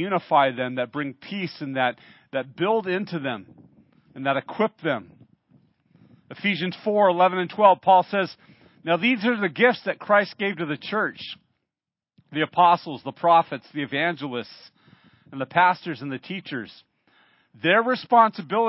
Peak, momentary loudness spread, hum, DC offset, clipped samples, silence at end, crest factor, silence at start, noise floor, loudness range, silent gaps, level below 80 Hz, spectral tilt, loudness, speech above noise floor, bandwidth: -4 dBFS; 15 LU; none; under 0.1%; under 0.1%; 0 s; 20 dB; 0 s; -89 dBFS; 7 LU; none; -74 dBFS; -9.5 dB/octave; -23 LUFS; 67 dB; 5.8 kHz